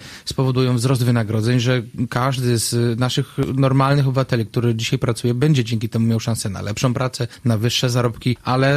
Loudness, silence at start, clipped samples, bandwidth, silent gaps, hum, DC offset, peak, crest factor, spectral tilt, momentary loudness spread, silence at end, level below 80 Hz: -19 LUFS; 0 s; under 0.1%; 15 kHz; none; none; under 0.1%; -4 dBFS; 14 dB; -5.5 dB/octave; 5 LU; 0 s; -48 dBFS